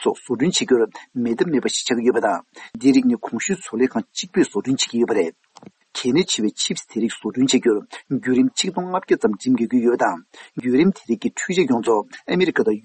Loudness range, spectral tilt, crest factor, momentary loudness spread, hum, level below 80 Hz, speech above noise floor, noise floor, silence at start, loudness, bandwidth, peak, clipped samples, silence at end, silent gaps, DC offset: 2 LU; -4 dB/octave; 16 dB; 7 LU; none; -64 dBFS; 27 dB; -47 dBFS; 0 s; -20 LUFS; 8.8 kHz; -4 dBFS; under 0.1%; 0.05 s; none; under 0.1%